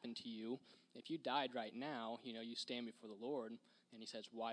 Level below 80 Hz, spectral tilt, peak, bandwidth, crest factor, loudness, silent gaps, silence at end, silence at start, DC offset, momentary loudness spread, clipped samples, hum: under -90 dBFS; -4 dB/octave; -26 dBFS; 10 kHz; 22 dB; -48 LUFS; none; 0 s; 0 s; under 0.1%; 14 LU; under 0.1%; none